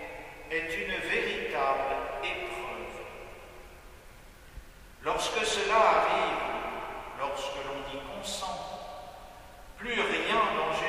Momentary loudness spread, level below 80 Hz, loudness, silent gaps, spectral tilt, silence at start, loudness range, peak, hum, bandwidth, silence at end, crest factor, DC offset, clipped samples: 23 LU; -54 dBFS; -30 LUFS; none; -2.5 dB/octave; 0 s; 9 LU; -10 dBFS; none; 15.5 kHz; 0 s; 22 dB; under 0.1%; under 0.1%